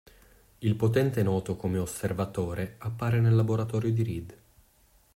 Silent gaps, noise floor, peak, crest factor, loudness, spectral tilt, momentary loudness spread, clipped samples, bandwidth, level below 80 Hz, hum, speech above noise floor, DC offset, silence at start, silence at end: none; -63 dBFS; -12 dBFS; 16 dB; -28 LUFS; -7.5 dB/octave; 10 LU; under 0.1%; 16 kHz; -56 dBFS; none; 36 dB; under 0.1%; 0.6 s; 0.8 s